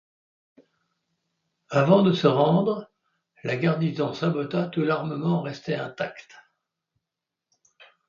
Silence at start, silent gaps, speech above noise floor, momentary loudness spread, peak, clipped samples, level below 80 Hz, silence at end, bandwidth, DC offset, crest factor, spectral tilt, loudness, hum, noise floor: 1.7 s; none; 63 dB; 14 LU; -4 dBFS; under 0.1%; -70 dBFS; 1.85 s; 7.2 kHz; under 0.1%; 22 dB; -8 dB/octave; -24 LUFS; none; -86 dBFS